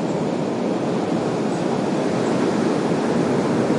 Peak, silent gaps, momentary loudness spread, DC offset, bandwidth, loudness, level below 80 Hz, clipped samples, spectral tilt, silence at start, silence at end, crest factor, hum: -6 dBFS; none; 3 LU; under 0.1%; 11.5 kHz; -21 LUFS; -60 dBFS; under 0.1%; -6.5 dB/octave; 0 s; 0 s; 14 dB; none